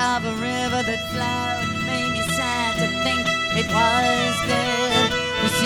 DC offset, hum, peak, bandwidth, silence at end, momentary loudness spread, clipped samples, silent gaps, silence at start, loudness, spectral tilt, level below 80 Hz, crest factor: under 0.1%; none; -6 dBFS; 20 kHz; 0 s; 5 LU; under 0.1%; none; 0 s; -21 LUFS; -3.5 dB/octave; -44 dBFS; 16 dB